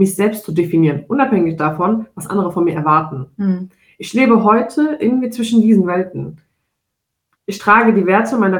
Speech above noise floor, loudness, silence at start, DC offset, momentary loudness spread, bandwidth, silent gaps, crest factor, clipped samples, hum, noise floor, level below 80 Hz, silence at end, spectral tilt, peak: 62 dB; -15 LUFS; 0 s; under 0.1%; 13 LU; 17.5 kHz; none; 14 dB; under 0.1%; none; -76 dBFS; -58 dBFS; 0 s; -6.5 dB/octave; 0 dBFS